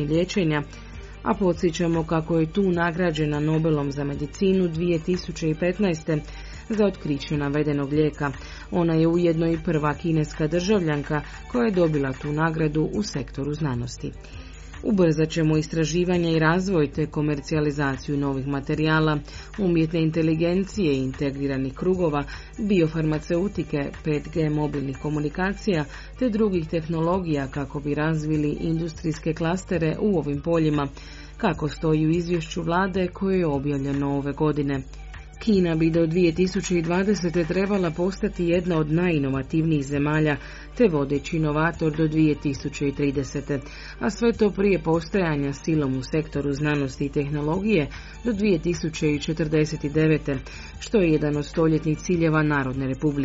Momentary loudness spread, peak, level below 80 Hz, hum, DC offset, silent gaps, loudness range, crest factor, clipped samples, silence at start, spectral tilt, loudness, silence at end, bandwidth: 8 LU; -6 dBFS; -40 dBFS; none; under 0.1%; none; 2 LU; 16 dB; under 0.1%; 0 s; -6.5 dB/octave; -24 LUFS; 0 s; 8 kHz